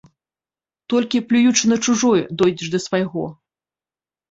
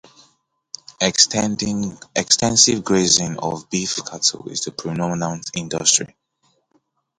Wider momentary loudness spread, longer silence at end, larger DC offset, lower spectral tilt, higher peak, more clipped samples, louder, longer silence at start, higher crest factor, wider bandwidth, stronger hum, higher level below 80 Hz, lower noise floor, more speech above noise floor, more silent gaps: second, 9 LU vs 12 LU; second, 1 s vs 1.15 s; neither; first, -4 dB/octave vs -2.5 dB/octave; about the same, -2 dBFS vs 0 dBFS; neither; about the same, -18 LUFS vs -18 LUFS; about the same, 0.9 s vs 1 s; about the same, 18 dB vs 22 dB; second, 8 kHz vs 11.5 kHz; neither; second, -60 dBFS vs -52 dBFS; first, under -90 dBFS vs -65 dBFS; first, over 72 dB vs 45 dB; neither